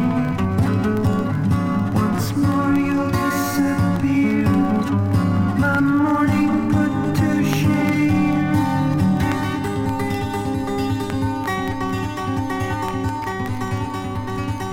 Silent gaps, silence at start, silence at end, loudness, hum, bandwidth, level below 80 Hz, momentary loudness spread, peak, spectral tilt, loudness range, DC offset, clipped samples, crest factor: none; 0 s; 0 s; -20 LUFS; none; 17 kHz; -42 dBFS; 7 LU; -4 dBFS; -7 dB/octave; 5 LU; under 0.1%; under 0.1%; 14 dB